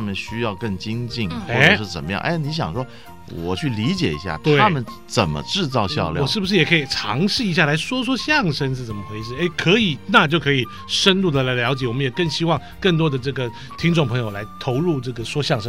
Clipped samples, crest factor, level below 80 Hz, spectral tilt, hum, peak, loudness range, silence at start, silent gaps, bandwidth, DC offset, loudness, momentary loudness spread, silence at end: under 0.1%; 20 dB; -46 dBFS; -5 dB/octave; none; 0 dBFS; 3 LU; 0 s; none; 15 kHz; 0.8%; -20 LUFS; 11 LU; 0 s